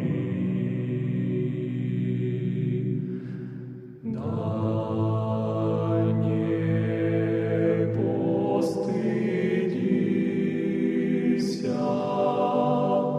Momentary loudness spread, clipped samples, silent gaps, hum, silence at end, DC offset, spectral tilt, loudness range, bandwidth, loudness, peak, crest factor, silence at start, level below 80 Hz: 5 LU; under 0.1%; none; none; 0 s; under 0.1%; -9 dB/octave; 4 LU; 11 kHz; -26 LUFS; -10 dBFS; 14 dB; 0 s; -64 dBFS